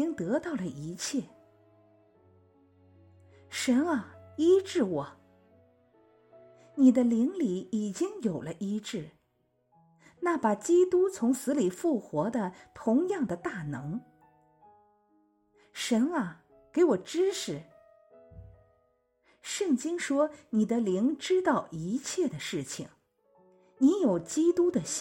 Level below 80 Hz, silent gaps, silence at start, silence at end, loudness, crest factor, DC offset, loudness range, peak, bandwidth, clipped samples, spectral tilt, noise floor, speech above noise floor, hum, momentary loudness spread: -68 dBFS; none; 0 s; 0 s; -29 LUFS; 20 dB; under 0.1%; 6 LU; -10 dBFS; 16.5 kHz; under 0.1%; -5 dB/octave; -74 dBFS; 45 dB; none; 13 LU